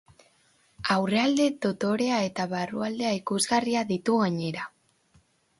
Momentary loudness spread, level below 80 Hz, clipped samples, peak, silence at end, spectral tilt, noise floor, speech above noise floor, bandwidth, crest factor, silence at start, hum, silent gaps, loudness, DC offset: 7 LU; -66 dBFS; under 0.1%; -10 dBFS; 0.9 s; -4.5 dB/octave; -65 dBFS; 39 dB; 11.5 kHz; 18 dB; 0.8 s; none; none; -26 LUFS; under 0.1%